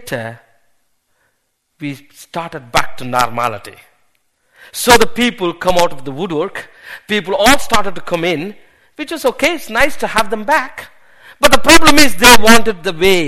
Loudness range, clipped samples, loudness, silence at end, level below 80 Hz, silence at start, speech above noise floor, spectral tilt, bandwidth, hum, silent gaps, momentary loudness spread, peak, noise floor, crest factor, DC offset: 11 LU; 0.6%; -12 LUFS; 0 s; -32 dBFS; 0 s; 54 dB; -2.5 dB/octave; over 20 kHz; none; none; 21 LU; 0 dBFS; -66 dBFS; 14 dB; under 0.1%